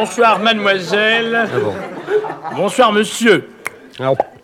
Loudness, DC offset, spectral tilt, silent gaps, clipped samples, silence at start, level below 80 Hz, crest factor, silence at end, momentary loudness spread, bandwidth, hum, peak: -15 LUFS; under 0.1%; -4 dB/octave; none; under 0.1%; 0 s; -62 dBFS; 16 dB; 0.15 s; 12 LU; 16 kHz; none; 0 dBFS